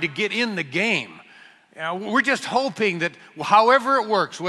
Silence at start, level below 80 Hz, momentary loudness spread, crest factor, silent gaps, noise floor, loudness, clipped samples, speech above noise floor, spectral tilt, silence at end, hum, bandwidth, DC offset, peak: 0 s; -68 dBFS; 12 LU; 20 dB; none; -50 dBFS; -21 LUFS; under 0.1%; 28 dB; -4 dB/octave; 0 s; none; 12 kHz; under 0.1%; -2 dBFS